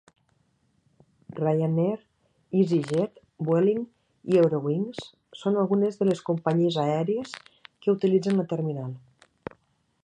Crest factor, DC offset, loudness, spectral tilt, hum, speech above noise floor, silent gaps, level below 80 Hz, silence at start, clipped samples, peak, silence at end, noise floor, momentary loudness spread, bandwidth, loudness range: 18 dB; under 0.1%; -26 LUFS; -8 dB/octave; none; 44 dB; none; -70 dBFS; 1.3 s; under 0.1%; -8 dBFS; 1.05 s; -69 dBFS; 19 LU; 10 kHz; 3 LU